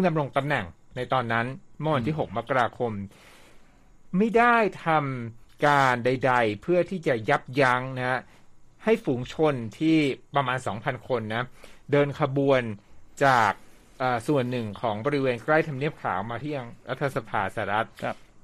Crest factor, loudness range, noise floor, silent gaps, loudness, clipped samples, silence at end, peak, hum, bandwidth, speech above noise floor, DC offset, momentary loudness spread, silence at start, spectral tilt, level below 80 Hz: 20 dB; 4 LU; -51 dBFS; none; -26 LUFS; under 0.1%; 0.05 s; -6 dBFS; none; 14 kHz; 26 dB; under 0.1%; 11 LU; 0 s; -6.5 dB/octave; -56 dBFS